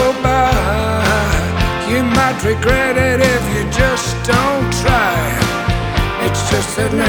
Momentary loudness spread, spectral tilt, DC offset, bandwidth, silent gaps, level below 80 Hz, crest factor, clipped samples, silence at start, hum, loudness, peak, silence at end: 4 LU; -5 dB/octave; under 0.1%; over 20 kHz; none; -24 dBFS; 14 dB; under 0.1%; 0 s; none; -15 LUFS; 0 dBFS; 0 s